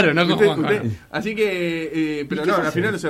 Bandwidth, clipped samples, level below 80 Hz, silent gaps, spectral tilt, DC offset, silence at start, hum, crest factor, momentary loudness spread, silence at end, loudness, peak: 15.5 kHz; under 0.1%; -54 dBFS; none; -6 dB/octave; under 0.1%; 0 s; none; 16 dB; 8 LU; 0 s; -20 LUFS; -4 dBFS